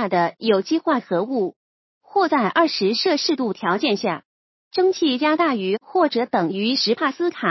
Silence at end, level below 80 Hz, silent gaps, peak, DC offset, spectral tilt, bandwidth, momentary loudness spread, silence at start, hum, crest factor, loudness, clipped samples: 0 s; -76 dBFS; 1.56-2.01 s, 4.25-4.71 s; -4 dBFS; under 0.1%; -5 dB/octave; 6.2 kHz; 5 LU; 0 s; none; 16 dB; -20 LUFS; under 0.1%